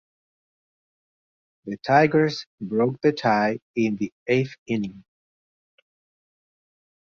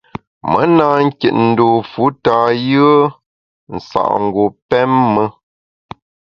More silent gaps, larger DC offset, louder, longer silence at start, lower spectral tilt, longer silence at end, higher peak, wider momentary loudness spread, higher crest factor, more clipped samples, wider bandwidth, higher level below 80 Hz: about the same, 2.46-2.58 s, 3.62-3.74 s, 4.12-4.26 s, 4.58-4.66 s vs 3.26-3.67 s, 4.62-4.69 s; neither; second, -23 LUFS vs -13 LUFS; first, 1.65 s vs 0.45 s; second, -7 dB/octave vs -8.5 dB/octave; first, 2 s vs 1 s; second, -6 dBFS vs 0 dBFS; first, 14 LU vs 10 LU; first, 20 dB vs 14 dB; neither; about the same, 7.2 kHz vs 7 kHz; second, -64 dBFS vs -50 dBFS